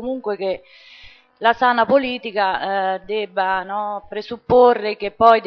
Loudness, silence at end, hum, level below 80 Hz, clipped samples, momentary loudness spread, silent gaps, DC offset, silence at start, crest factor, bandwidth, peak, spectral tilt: -19 LUFS; 0 s; none; -54 dBFS; under 0.1%; 12 LU; none; under 0.1%; 0 s; 18 dB; 6 kHz; 0 dBFS; -6.5 dB/octave